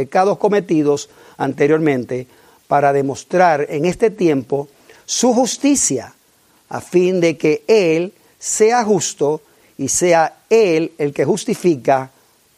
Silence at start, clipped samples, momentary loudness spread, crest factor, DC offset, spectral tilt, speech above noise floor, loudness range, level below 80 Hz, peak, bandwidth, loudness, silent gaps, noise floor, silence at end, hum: 0 s; under 0.1%; 11 LU; 16 dB; under 0.1%; -4.5 dB/octave; 39 dB; 2 LU; -58 dBFS; 0 dBFS; 15.5 kHz; -16 LUFS; none; -55 dBFS; 0.5 s; none